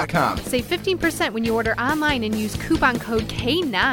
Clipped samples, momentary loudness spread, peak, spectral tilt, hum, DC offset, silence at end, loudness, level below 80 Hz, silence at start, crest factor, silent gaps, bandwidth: under 0.1%; 5 LU; -4 dBFS; -4.5 dB/octave; none; under 0.1%; 0 s; -21 LUFS; -38 dBFS; 0 s; 18 dB; none; 17.5 kHz